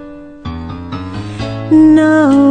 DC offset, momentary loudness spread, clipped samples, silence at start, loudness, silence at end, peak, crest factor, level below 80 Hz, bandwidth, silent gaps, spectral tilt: under 0.1%; 19 LU; under 0.1%; 0 s; -9 LUFS; 0 s; 0 dBFS; 12 dB; -38 dBFS; 9.2 kHz; none; -7.5 dB/octave